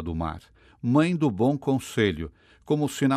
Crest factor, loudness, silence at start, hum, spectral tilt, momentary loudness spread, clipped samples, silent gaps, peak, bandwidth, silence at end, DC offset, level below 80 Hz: 16 dB; -25 LUFS; 0 s; none; -6.5 dB/octave; 12 LU; under 0.1%; none; -8 dBFS; 14 kHz; 0 s; under 0.1%; -50 dBFS